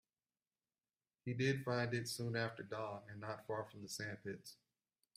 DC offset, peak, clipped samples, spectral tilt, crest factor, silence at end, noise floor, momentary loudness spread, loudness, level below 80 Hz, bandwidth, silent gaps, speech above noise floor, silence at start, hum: under 0.1%; -24 dBFS; under 0.1%; -5 dB/octave; 20 dB; 0.6 s; under -90 dBFS; 11 LU; -43 LUFS; -80 dBFS; 15.5 kHz; none; over 47 dB; 1.25 s; none